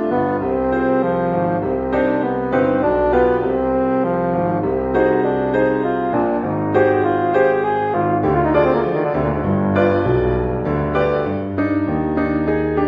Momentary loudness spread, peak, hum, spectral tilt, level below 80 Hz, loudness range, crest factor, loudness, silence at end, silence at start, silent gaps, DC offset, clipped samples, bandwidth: 4 LU; -2 dBFS; none; -10 dB/octave; -36 dBFS; 1 LU; 14 dB; -18 LUFS; 0 s; 0 s; none; under 0.1%; under 0.1%; 5.2 kHz